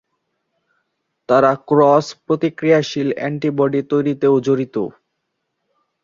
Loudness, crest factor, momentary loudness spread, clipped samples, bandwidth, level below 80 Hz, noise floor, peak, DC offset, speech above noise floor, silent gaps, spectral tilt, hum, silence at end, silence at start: -17 LUFS; 16 dB; 7 LU; under 0.1%; 7.6 kHz; -64 dBFS; -74 dBFS; -2 dBFS; under 0.1%; 58 dB; none; -7 dB/octave; none; 1.15 s; 1.3 s